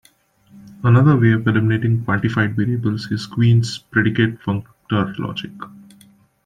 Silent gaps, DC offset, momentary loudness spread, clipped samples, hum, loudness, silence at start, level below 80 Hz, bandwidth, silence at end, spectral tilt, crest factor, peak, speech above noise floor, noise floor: none; under 0.1%; 13 LU; under 0.1%; none; -18 LUFS; 0.55 s; -52 dBFS; 9.4 kHz; 0.75 s; -7.5 dB/octave; 16 dB; -2 dBFS; 38 dB; -55 dBFS